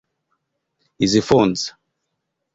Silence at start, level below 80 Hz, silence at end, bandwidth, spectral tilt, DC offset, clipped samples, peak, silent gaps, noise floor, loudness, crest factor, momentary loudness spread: 1 s; -50 dBFS; 0.85 s; 8 kHz; -5 dB/octave; under 0.1%; under 0.1%; -2 dBFS; none; -77 dBFS; -18 LUFS; 20 dB; 11 LU